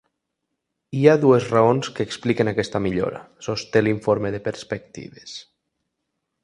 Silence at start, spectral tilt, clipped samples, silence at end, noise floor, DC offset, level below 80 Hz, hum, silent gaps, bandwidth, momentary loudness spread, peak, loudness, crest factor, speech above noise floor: 0.9 s; -6.5 dB/octave; under 0.1%; 1 s; -79 dBFS; under 0.1%; -54 dBFS; none; none; 10.5 kHz; 20 LU; 0 dBFS; -21 LUFS; 22 dB; 58 dB